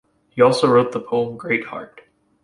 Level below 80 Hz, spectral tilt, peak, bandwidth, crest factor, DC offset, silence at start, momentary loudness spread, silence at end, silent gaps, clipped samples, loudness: -60 dBFS; -6 dB/octave; -2 dBFS; 11.5 kHz; 18 dB; under 0.1%; 0.35 s; 18 LU; 0.45 s; none; under 0.1%; -18 LUFS